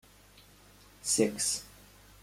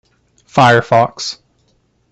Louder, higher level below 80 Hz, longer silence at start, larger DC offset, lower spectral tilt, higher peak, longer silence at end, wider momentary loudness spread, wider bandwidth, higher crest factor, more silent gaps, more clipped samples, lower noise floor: second, -30 LUFS vs -13 LUFS; second, -62 dBFS vs -52 dBFS; first, 1.05 s vs 0.55 s; neither; second, -2.5 dB/octave vs -5 dB/octave; second, -12 dBFS vs 0 dBFS; second, 0.55 s vs 0.8 s; about the same, 13 LU vs 14 LU; first, 16.5 kHz vs 8.6 kHz; first, 22 dB vs 16 dB; neither; neither; about the same, -58 dBFS vs -59 dBFS